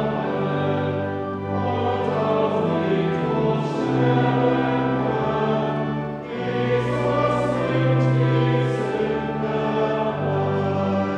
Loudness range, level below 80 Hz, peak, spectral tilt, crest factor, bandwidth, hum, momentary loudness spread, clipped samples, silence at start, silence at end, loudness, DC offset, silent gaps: 2 LU; -50 dBFS; -8 dBFS; -8.5 dB/octave; 14 dB; 8.4 kHz; none; 6 LU; under 0.1%; 0 s; 0 s; -22 LUFS; under 0.1%; none